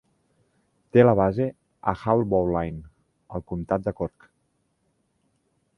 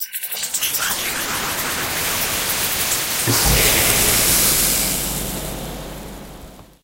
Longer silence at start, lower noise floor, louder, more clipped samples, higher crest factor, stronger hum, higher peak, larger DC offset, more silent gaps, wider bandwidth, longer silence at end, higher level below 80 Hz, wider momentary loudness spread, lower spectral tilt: first, 0.95 s vs 0 s; first, -71 dBFS vs -40 dBFS; second, -24 LUFS vs -17 LUFS; neither; about the same, 24 dB vs 20 dB; neither; about the same, -2 dBFS vs 0 dBFS; neither; neither; second, 6 kHz vs 16.5 kHz; first, 1.7 s vs 0.2 s; second, -48 dBFS vs -34 dBFS; about the same, 15 LU vs 16 LU; first, -10 dB/octave vs -1.5 dB/octave